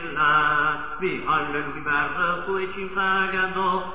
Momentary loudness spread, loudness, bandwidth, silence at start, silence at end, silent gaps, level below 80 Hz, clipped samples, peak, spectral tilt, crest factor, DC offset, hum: 9 LU; -23 LUFS; 4 kHz; 0 s; 0 s; none; -50 dBFS; under 0.1%; -10 dBFS; -8 dB/octave; 14 dB; 1%; none